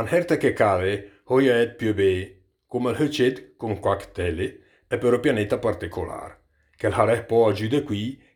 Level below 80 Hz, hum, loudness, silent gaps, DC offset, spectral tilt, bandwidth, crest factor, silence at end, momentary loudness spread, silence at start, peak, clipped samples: -50 dBFS; none; -23 LUFS; none; under 0.1%; -6.5 dB/octave; 19 kHz; 20 dB; 0.2 s; 12 LU; 0 s; -4 dBFS; under 0.1%